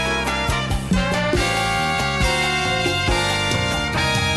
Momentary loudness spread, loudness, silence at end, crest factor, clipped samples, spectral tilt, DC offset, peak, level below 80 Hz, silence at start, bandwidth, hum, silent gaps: 2 LU; -19 LUFS; 0 s; 14 dB; under 0.1%; -4 dB/octave; under 0.1%; -6 dBFS; -30 dBFS; 0 s; 13 kHz; none; none